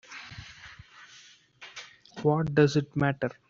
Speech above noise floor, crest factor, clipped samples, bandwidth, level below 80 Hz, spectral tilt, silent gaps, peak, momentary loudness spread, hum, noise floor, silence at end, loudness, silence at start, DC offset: 30 dB; 22 dB; under 0.1%; 7.6 kHz; -60 dBFS; -6 dB/octave; none; -8 dBFS; 26 LU; none; -55 dBFS; 0.15 s; -26 LUFS; 0.1 s; under 0.1%